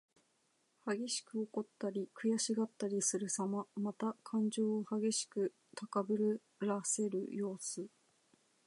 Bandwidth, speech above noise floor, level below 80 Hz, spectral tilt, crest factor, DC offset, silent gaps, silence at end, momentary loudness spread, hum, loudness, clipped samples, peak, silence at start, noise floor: 11.5 kHz; 40 dB; under -90 dBFS; -4 dB/octave; 18 dB; under 0.1%; none; 0.8 s; 7 LU; none; -38 LUFS; under 0.1%; -22 dBFS; 0.85 s; -77 dBFS